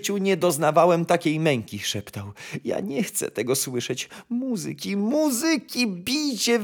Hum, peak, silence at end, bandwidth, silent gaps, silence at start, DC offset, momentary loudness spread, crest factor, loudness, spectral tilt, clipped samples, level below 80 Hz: none; -4 dBFS; 0 s; over 20 kHz; none; 0 s; under 0.1%; 11 LU; 20 dB; -24 LUFS; -4 dB/octave; under 0.1%; -68 dBFS